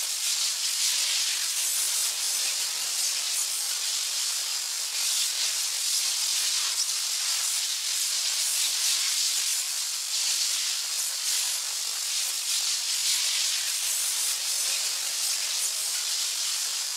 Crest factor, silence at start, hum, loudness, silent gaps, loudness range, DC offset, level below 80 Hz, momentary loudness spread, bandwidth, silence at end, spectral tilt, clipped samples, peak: 16 dB; 0 s; none; -24 LUFS; none; 1 LU; under 0.1%; -84 dBFS; 3 LU; 16 kHz; 0 s; 5.5 dB/octave; under 0.1%; -12 dBFS